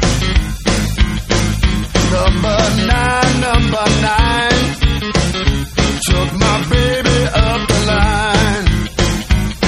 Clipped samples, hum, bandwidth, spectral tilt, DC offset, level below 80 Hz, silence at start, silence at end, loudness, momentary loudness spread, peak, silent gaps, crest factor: under 0.1%; none; 14.5 kHz; -4.5 dB/octave; under 0.1%; -18 dBFS; 0 s; 0 s; -14 LUFS; 4 LU; 0 dBFS; none; 14 dB